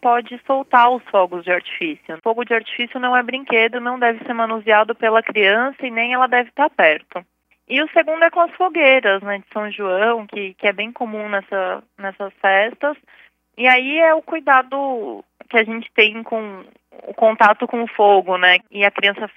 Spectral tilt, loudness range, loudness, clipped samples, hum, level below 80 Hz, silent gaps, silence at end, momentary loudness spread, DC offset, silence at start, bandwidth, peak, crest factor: -5.5 dB/octave; 4 LU; -17 LUFS; under 0.1%; none; -74 dBFS; none; 0.1 s; 12 LU; under 0.1%; 0.05 s; 6.2 kHz; 0 dBFS; 18 dB